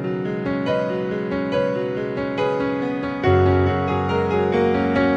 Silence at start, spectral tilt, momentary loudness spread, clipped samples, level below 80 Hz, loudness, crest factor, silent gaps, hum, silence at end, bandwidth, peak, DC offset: 0 s; -8.5 dB/octave; 7 LU; under 0.1%; -46 dBFS; -21 LUFS; 16 dB; none; none; 0 s; 7.6 kHz; -4 dBFS; under 0.1%